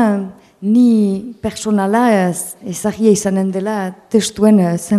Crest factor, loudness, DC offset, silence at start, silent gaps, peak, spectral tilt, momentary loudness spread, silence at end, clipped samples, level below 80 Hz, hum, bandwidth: 14 dB; -15 LUFS; under 0.1%; 0 s; none; 0 dBFS; -6 dB/octave; 11 LU; 0 s; under 0.1%; -52 dBFS; none; 14.5 kHz